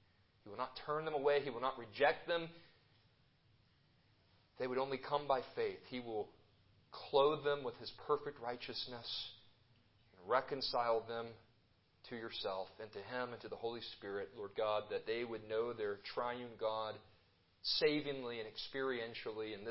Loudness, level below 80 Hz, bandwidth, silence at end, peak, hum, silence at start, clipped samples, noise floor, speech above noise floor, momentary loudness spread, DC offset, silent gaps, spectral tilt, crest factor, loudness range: -41 LUFS; -76 dBFS; 5.6 kHz; 0 s; -20 dBFS; none; 0.45 s; under 0.1%; -74 dBFS; 33 dB; 12 LU; under 0.1%; none; -2 dB/octave; 22 dB; 4 LU